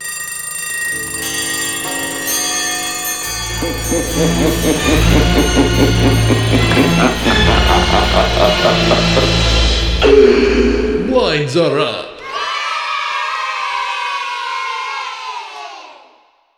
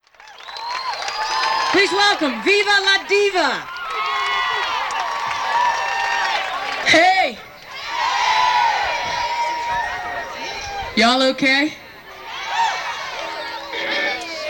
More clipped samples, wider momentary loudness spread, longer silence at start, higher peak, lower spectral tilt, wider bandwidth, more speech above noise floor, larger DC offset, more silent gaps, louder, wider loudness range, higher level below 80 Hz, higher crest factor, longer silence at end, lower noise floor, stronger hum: neither; second, 9 LU vs 12 LU; second, 0 s vs 0.2 s; first, 0 dBFS vs -4 dBFS; first, -4 dB/octave vs -2 dB/octave; about the same, 18.5 kHz vs over 20 kHz; first, 39 dB vs 24 dB; neither; neither; first, -14 LUFS vs -18 LUFS; first, 7 LU vs 3 LU; first, -22 dBFS vs -52 dBFS; about the same, 14 dB vs 16 dB; first, 0.65 s vs 0 s; first, -51 dBFS vs -40 dBFS; neither